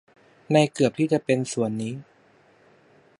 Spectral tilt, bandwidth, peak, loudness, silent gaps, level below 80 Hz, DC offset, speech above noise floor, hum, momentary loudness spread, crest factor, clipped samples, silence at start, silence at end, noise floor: -6 dB/octave; 11.5 kHz; -4 dBFS; -24 LUFS; none; -68 dBFS; under 0.1%; 35 dB; none; 11 LU; 22 dB; under 0.1%; 0.5 s; 1.2 s; -58 dBFS